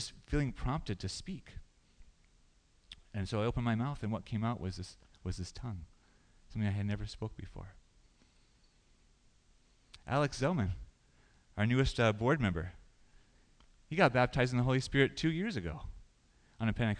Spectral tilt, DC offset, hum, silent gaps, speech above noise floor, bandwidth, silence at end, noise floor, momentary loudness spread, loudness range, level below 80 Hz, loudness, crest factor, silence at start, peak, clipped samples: -6.5 dB/octave; under 0.1%; none; none; 34 dB; 10 kHz; 0 s; -67 dBFS; 18 LU; 10 LU; -50 dBFS; -34 LUFS; 24 dB; 0 s; -12 dBFS; under 0.1%